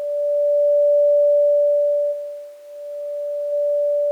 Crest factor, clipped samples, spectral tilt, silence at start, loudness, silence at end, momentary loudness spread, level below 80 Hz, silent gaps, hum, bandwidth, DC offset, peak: 8 dB; under 0.1%; -1.5 dB/octave; 0 s; -18 LUFS; 0 s; 18 LU; under -90 dBFS; none; none; 1.5 kHz; under 0.1%; -12 dBFS